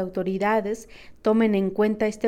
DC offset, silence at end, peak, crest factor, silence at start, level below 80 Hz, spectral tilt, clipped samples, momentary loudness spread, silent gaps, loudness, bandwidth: under 0.1%; 0 s; -10 dBFS; 14 dB; 0 s; -54 dBFS; -7 dB/octave; under 0.1%; 8 LU; none; -23 LUFS; 13 kHz